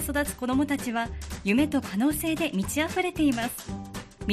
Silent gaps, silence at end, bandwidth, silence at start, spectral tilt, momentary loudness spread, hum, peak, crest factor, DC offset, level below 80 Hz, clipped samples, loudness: none; 0 s; 15 kHz; 0 s; -4.5 dB/octave; 11 LU; none; -12 dBFS; 16 dB; under 0.1%; -44 dBFS; under 0.1%; -27 LUFS